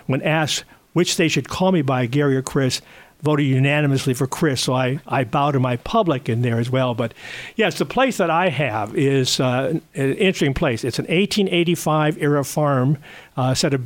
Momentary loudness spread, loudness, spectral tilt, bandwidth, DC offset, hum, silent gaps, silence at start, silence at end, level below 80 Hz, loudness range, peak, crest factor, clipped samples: 5 LU; -20 LUFS; -5.5 dB/octave; 17 kHz; under 0.1%; none; none; 0.1 s; 0 s; -48 dBFS; 1 LU; -4 dBFS; 14 dB; under 0.1%